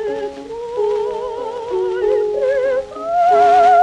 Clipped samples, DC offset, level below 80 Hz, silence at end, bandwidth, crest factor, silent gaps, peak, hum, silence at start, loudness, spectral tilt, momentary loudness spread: under 0.1%; under 0.1%; -50 dBFS; 0 s; 9.4 kHz; 12 dB; none; -4 dBFS; none; 0 s; -17 LUFS; -4.5 dB/octave; 14 LU